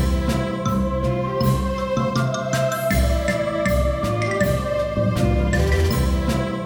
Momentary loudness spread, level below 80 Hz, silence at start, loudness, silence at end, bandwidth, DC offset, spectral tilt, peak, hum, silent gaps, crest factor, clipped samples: 3 LU; -26 dBFS; 0 s; -21 LUFS; 0 s; over 20 kHz; under 0.1%; -6 dB/octave; -6 dBFS; none; none; 14 dB; under 0.1%